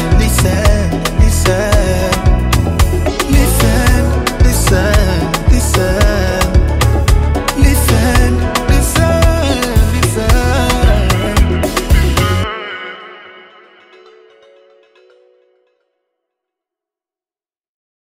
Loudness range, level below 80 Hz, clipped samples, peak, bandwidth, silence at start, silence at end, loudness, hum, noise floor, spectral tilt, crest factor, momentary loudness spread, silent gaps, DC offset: 6 LU; -16 dBFS; under 0.1%; 0 dBFS; 16.5 kHz; 0 s; 4.75 s; -12 LUFS; none; under -90 dBFS; -5 dB/octave; 12 dB; 4 LU; none; under 0.1%